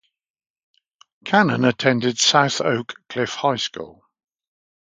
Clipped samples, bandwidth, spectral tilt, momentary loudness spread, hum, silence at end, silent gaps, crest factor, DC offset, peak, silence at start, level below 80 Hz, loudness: under 0.1%; 9.6 kHz; -3.5 dB/octave; 15 LU; none; 1.05 s; none; 22 dB; under 0.1%; 0 dBFS; 1.25 s; -64 dBFS; -19 LUFS